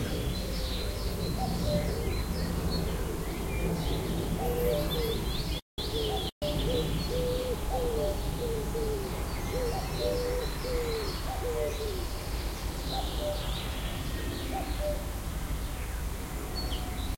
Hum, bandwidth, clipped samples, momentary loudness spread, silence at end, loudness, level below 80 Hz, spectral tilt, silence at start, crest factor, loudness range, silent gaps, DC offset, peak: none; 16.5 kHz; under 0.1%; 6 LU; 0 s; -33 LUFS; -36 dBFS; -5 dB/octave; 0 s; 16 dB; 3 LU; 5.62-5.78 s, 6.32-6.41 s; under 0.1%; -16 dBFS